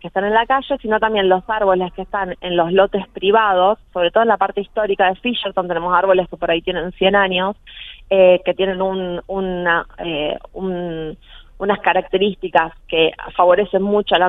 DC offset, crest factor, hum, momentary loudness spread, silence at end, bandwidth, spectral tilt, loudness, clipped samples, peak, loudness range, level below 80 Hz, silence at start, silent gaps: under 0.1%; 18 dB; none; 10 LU; 0 s; 4 kHz; -8 dB/octave; -17 LUFS; under 0.1%; 0 dBFS; 4 LU; -44 dBFS; 0.05 s; none